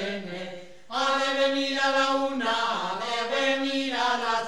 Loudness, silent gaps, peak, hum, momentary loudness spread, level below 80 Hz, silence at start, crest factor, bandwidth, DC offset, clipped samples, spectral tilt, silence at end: -25 LUFS; none; -10 dBFS; none; 11 LU; -68 dBFS; 0 s; 16 dB; 12 kHz; 0.5%; under 0.1%; -2.5 dB/octave; 0 s